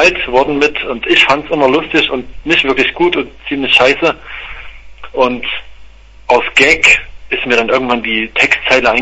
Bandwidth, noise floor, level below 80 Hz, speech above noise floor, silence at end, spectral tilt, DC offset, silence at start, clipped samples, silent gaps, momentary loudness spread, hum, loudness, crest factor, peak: 11 kHz; -35 dBFS; -36 dBFS; 23 dB; 0 s; -3 dB/octave; under 0.1%; 0 s; 0.2%; none; 13 LU; none; -11 LUFS; 12 dB; 0 dBFS